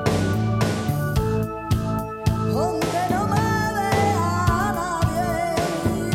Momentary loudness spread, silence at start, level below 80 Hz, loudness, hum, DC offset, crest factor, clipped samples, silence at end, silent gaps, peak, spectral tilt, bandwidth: 4 LU; 0 s; -36 dBFS; -22 LUFS; none; under 0.1%; 16 dB; under 0.1%; 0 s; none; -6 dBFS; -6 dB/octave; 16.5 kHz